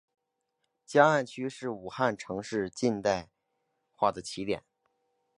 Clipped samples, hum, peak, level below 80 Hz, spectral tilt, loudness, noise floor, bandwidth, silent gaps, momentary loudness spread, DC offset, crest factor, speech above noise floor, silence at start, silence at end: under 0.1%; none; -6 dBFS; -66 dBFS; -5 dB/octave; -30 LUFS; -81 dBFS; 11.5 kHz; none; 13 LU; under 0.1%; 26 dB; 52 dB; 0.9 s; 0.8 s